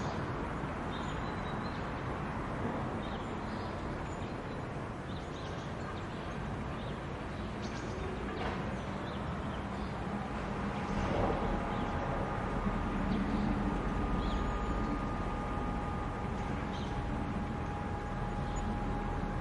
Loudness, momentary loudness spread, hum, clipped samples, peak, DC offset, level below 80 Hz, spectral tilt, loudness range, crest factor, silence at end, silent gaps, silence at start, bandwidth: -37 LUFS; 6 LU; none; under 0.1%; -18 dBFS; under 0.1%; -42 dBFS; -7 dB/octave; 5 LU; 18 dB; 0 s; none; 0 s; 11.5 kHz